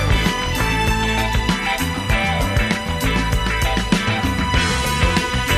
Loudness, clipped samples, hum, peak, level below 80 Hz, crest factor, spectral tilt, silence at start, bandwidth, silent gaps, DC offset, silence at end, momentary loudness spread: -19 LUFS; under 0.1%; none; -2 dBFS; -24 dBFS; 16 dB; -4.5 dB/octave; 0 s; 15.5 kHz; none; under 0.1%; 0 s; 2 LU